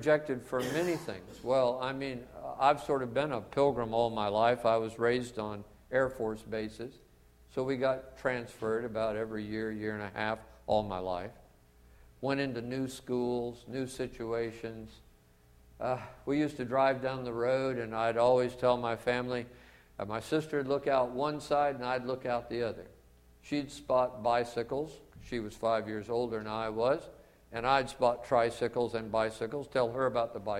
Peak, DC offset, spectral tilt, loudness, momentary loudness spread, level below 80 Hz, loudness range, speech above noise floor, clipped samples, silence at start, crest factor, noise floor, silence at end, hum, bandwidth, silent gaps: -12 dBFS; under 0.1%; -6 dB/octave; -33 LUFS; 11 LU; -60 dBFS; 6 LU; 30 dB; under 0.1%; 0 s; 20 dB; -62 dBFS; 0 s; none; 16 kHz; none